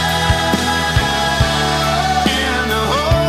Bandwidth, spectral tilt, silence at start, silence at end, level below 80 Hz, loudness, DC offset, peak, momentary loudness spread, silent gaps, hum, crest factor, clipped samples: 16 kHz; -4 dB/octave; 0 s; 0 s; -26 dBFS; -15 LUFS; under 0.1%; -4 dBFS; 1 LU; none; none; 12 dB; under 0.1%